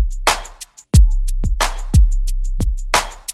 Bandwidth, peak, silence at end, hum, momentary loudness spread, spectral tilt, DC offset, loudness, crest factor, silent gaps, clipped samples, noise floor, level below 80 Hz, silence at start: 13.5 kHz; 0 dBFS; 0 s; none; 10 LU; -4 dB/octave; under 0.1%; -18 LUFS; 16 dB; none; under 0.1%; -38 dBFS; -16 dBFS; 0 s